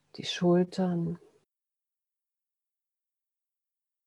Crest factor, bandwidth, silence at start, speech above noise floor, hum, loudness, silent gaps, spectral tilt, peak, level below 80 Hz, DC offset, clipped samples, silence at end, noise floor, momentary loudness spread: 20 dB; 9.4 kHz; 0.15 s; 61 dB; none; -29 LUFS; none; -6.5 dB/octave; -14 dBFS; -78 dBFS; under 0.1%; under 0.1%; 2.9 s; -89 dBFS; 11 LU